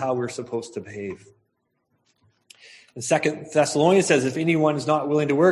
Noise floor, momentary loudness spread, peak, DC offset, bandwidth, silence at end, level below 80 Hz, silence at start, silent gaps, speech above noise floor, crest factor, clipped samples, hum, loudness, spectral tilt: -73 dBFS; 16 LU; -4 dBFS; under 0.1%; 12 kHz; 0 s; -66 dBFS; 0 s; none; 51 dB; 18 dB; under 0.1%; none; -22 LUFS; -5 dB/octave